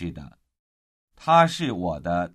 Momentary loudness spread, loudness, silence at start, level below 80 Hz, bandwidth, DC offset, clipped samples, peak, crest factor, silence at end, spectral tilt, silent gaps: 17 LU; -22 LUFS; 0 s; -50 dBFS; 12.5 kHz; under 0.1%; under 0.1%; -4 dBFS; 20 dB; 0.05 s; -5.5 dB/octave; 0.59-1.08 s